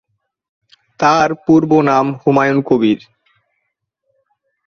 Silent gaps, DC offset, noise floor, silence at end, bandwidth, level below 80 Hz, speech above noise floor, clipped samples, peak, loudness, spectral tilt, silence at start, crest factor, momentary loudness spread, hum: none; under 0.1%; -72 dBFS; 1.7 s; 6.8 kHz; -56 dBFS; 60 dB; under 0.1%; 0 dBFS; -13 LUFS; -6.5 dB/octave; 1 s; 16 dB; 5 LU; none